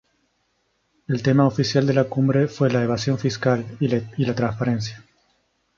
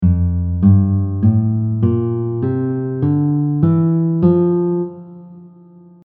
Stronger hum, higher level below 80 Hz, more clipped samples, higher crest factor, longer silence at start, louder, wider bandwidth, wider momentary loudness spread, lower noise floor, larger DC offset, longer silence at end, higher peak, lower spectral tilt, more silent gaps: neither; second, -56 dBFS vs -36 dBFS; neither; about the same, 18 dB vs 14 dB; first, 1.1 s vs 0 s; second, -21 LUFS vs -16 LUFS; first, 7.4 kHz vs 2.4 kHz; about the same, 6 LU vs 7 LU; first, -69 dBFS vs -43 dBFS; neither; first, 0.8 s vs 0.6 s; second, -4 dBFS vs 0 dBFS; second, -7 dB/octave vs -13 dB/octave; neither